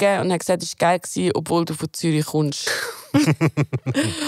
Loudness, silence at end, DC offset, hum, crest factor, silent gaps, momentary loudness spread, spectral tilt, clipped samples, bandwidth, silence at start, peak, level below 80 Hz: -21 LUFS; 0 s; under 0.1%; none; 16 dB; none; 5 LU; -5 dB/octave; under 0.1%; 16 kHz; 0 s; -4 dBFS; -60 dBFS